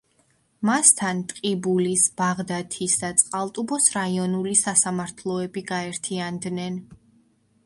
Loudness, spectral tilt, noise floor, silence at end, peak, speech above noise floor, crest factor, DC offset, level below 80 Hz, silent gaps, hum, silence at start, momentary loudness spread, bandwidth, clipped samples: -22 LUFS; -3 dB/octave; -65 dBFS; 0.7 s; 0 dBFS; 41 dB; 24 dB; under 0.1%; -64 dBFS; none; none; 0.6 s; 12 LU; 12 kHz; under 0.1%